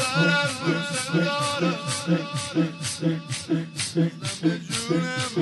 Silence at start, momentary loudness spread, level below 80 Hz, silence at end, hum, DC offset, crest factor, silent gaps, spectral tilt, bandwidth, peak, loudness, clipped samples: 0 s; 5 LU; -62 dBFS; 0 s; none; under 0.1%; 16 dB; none; -4.5 dB/octave; 11.5 kHz; -8 dBFS; -25 LUFS; under 0.1%